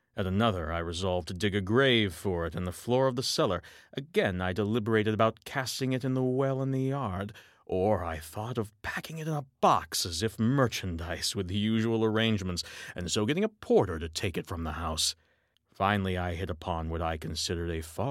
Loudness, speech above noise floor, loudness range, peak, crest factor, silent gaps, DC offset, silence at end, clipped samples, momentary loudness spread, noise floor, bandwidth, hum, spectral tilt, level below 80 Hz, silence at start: -30 LUFS; 41 dB; 3 LU; -10 dBFS; 20 dB; none; under 0.1%; 0 s; under 0.1%; 9 LU; -71 dBFS; 16.5 kHz; none; -5 dB/octave; -50 dBFS; 0.15 s